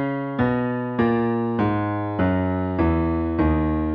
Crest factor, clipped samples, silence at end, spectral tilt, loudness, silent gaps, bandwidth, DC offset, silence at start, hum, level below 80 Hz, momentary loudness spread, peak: 14 dB; under 0.1%; 0 s; -11 dB/octave; -22 LUFS; none; 5.2 kHz; under 0.1%; 0 s; none; -34 dBFS; 3 LU; -8 dBFS